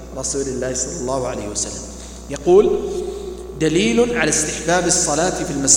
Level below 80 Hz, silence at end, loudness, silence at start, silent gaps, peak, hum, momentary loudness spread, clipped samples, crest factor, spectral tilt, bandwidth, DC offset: -38 dBFS; 0 s; -18 LUFS; 0 s; none; 0 dBFS; 60 Hz at -35 dBFS; 15 LU; under 0.1%; 18 dB; -3 dB/octave; 17 kHz; under 0.1%